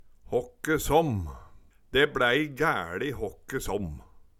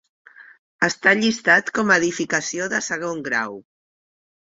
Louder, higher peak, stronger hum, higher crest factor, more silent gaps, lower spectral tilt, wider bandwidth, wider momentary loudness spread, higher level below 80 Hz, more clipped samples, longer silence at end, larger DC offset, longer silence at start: second, -28 LUFS vs -19 LUFS; second, -8 dBFS vs -2 dBFS; neither; about the same, 20 dB vs 20 dB; second, none vs 0.59-0.79 s; first, -4.5 dB/octave vs -3 dB/octave; first, 16.5 kHz vs 8 kHz; first, 12 LU vs 9 LU; first, -44 dBFS vs -64 dBFS; neither; second, 0.2 s vs 0.9 s; neither; about the same, 0.3 s vs 0.4 s